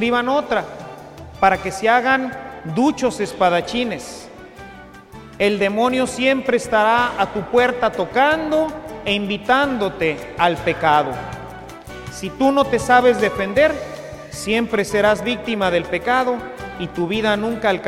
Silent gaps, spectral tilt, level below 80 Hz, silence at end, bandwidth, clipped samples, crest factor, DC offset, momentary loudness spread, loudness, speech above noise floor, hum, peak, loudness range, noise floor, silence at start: none; -4.5 dB/octave; -46 dBFS; 0 s; 15.5 kHz; under 0.1%; 18 dB; under 0.1%; 17 LU; -18 LUFS; 21 dB; none; 0 dBFS; 3 LU; -39 dBFS; 0 s